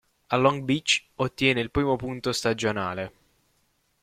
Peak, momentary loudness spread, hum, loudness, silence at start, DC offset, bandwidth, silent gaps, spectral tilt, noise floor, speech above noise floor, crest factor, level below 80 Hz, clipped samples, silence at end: -6 dBFS; 8 LU; none; -25 LUFS; 0.3 s; under 0.1%; 15.5 kHz; none; -4.5 dB/octave; -70 dBFS; 44 dB; 22 dB; -52 dBFS; under 0.1%; 0.95 s